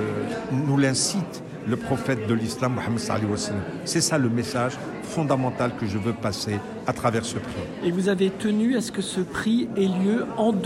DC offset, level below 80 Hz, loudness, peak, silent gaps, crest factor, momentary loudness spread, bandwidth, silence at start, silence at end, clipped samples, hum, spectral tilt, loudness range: under 0.1%; -54 dBFS; -25 LUFS; -10 dBFS; none; 16 dB; 7 LU; 14 kHz; 0 s; 0 s; under 0.1%; none; -5 dB/octave; 2 LU